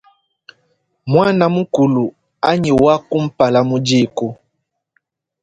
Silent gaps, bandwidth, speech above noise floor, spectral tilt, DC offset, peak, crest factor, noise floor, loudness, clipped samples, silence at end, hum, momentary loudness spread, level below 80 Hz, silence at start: none; 9.2 kHz; 59 dB; -6.5 dB/octave; under 0.1%; 0 dBFS; 16 dB; -73 dBFS; -15 LUFS; under 0.1%; 1.1 s; none; 10 LU; -48 dBFS; 1.05 s